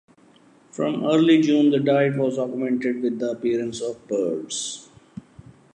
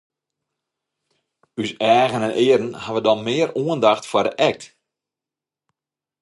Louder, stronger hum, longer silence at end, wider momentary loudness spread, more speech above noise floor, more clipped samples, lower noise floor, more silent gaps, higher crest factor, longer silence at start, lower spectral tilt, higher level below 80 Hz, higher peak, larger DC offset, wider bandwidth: second, -22 LUFS vs -19 LUFS; neither; second, 0.95 s vs 1.55 s; first, 22 LU vs 11 LU; second, 33 dB vs 70 dB; neither; second, -54 dBFS vs -89 dBFS; neither; about the same, 16 dB vs 20 dB; second, 0.75 s vs 1.55 s; about the same, -5.5 dB/octave vs -5 dB/octave; about the same, -66 dBFS vs -66 dBFS; second, -6 dBFS vs -2 dBFS; neither; about the same, 11 kHz vs 11.5 kHz